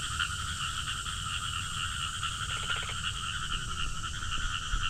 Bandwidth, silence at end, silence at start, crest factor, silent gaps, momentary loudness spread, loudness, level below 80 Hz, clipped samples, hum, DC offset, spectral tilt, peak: 16 kHz; 0 s; 0 s; 18 dB; none; 3 LU; -33 LUFS; -40 dBFS; under 0.1%; none; under 0.1%; -1.5 dB/octave; -16 dBFS